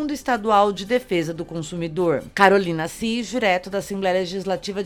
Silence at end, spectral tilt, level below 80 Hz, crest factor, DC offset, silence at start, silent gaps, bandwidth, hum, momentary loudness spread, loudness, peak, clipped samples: 0 s; -5 dB/octave; -50 dBFS; 22 dB; under 0.1%; 0 s; none; 18 kHz; none; 11 LU; -21 LUFS; 0 dBFS; under 0.1%